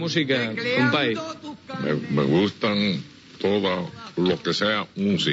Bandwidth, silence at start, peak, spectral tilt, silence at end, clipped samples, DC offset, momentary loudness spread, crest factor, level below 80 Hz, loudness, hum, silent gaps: 8 kHz; 0 s; -6 dBFS; -5.5 dB/octave; 0 s; under 0.1%; under 0.1%; 11 LU; 18 dB; -64 dBFS; -23 LUFS; none; none